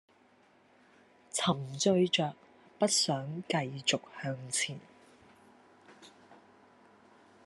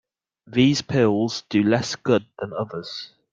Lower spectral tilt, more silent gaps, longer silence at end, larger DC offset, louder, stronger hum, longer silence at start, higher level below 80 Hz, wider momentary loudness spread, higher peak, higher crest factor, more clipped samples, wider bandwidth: second, -3.5 dB/octave vs -5.5 dB/octave; neither; first, 1.1 s vs 0.25 s; neither; second, -31 LUFS vs -22 LUFS; neither; first, 1.35 s vs 0.5 s; second, -80 dBFS vs -60 dBFS; second, 10 LU vs 13 LU; second, -14 dBFS vs -4 dBFS; about the same, 22 dB vs 18 dB; neither; first, 12.5 kHz vs 7.8 kHz